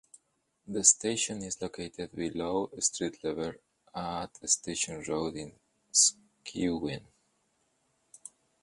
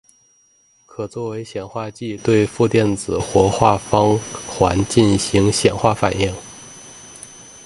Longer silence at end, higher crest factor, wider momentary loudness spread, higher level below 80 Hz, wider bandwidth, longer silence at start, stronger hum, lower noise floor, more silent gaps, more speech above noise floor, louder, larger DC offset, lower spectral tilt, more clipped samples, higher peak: first, 0.35 s vs 0.05 s; first, 26 dB vs 18 dB; about the same, 20 LU vs 21 LU; second, -62 dBFS vs -40 dBFS; about the same, 11.5 kHz vs 11.5 kHz; second, 0.65 s vs 1 s; neither; first, -76 dBFS vs -57 dBFS; neither; first, 44 dB vs 39 dB; second, -30 LUFS vs -18 LUFS; neither; second, -2 dB/octave vs -5.5 dB/octave; neither; second, -6 dBFS vs 0 dBFS